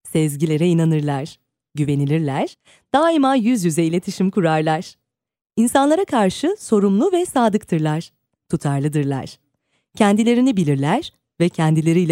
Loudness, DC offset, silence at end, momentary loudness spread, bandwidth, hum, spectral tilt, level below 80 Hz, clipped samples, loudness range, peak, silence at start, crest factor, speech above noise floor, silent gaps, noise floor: -18 LUFS; under 0.1%; 0 s; 10 LU; 15.5 kHz; none; -6.5 dB/octave; -58 dBFS; under 0.1%; 2 LU; -2 dBFS; 0.05 s; 16 dB; 52 dB; none; -69 dBFS